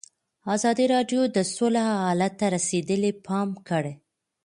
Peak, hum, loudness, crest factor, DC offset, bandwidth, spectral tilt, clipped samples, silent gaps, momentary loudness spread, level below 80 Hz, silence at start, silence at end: -10 dBFS; none; -25 LUFS; 16 dB; under 0.1%; 11.5 kHz; -5 dB/octave; under 0.1%; none; 6 LU; -68 dBFS; 0.45 s; 0.5 s